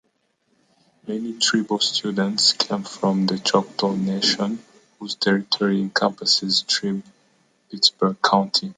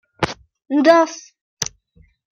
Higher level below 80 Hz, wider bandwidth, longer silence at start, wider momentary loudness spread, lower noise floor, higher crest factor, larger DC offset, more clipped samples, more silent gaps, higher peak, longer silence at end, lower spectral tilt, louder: second, -68 dBFS vs -52 dBFS; second, 9.6 kHz vs 16 kHz; first, 1.05 s vs 0.2 s; second, 12 LU vs 18 LU; first, -68 dBFS vs -55 dBFS; about the same, 20 dB vs 18 dB; neither; neither; second, none vs 1.41-1.57 s; about the same, -2 dBFS vs 0 dBFS; second, 0.05 s vs 0.65 s; about the same, -3.5 dB/octave vs -4 dB/octave; about the same, -20 LUFS vs -18 LUFS